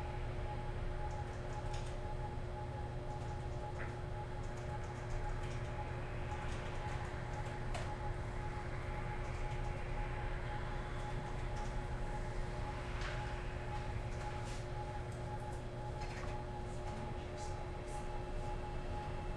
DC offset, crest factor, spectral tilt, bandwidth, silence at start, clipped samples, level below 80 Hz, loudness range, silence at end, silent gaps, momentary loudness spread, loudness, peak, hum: under 0.1%; 14 dB; -6 dB/octave; 11.5 kHz; 0 s; under 0.1%; -46 dBFS; 1 LU; 0 s; none; 2 LU; -44 LUFS; -28 dBFS; none